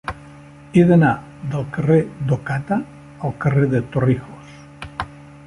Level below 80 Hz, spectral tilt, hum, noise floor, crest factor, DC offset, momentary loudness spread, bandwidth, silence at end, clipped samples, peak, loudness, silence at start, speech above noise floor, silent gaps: -46 dBFS; -9 dB/octave; none; -41 dBFS; 18 dB; under 0.1%; 20 LU; 11 kHz; 0.2 s; under 0.1%; -2 dBFS; -19 LUFS; 0.05 s; 24 dB; none